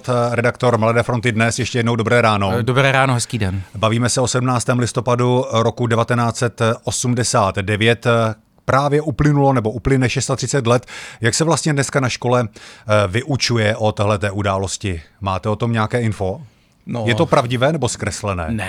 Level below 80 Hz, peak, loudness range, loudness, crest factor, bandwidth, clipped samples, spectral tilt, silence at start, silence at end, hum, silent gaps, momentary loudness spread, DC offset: -42 dBFS; 0 dBFS; 3 LU; -17 LUFS; 16 dB; 13.5 kHz; under 0.1%; -5 dB/octave; 0.05 s; 0 s; none; none; 7 LU; under 0.1%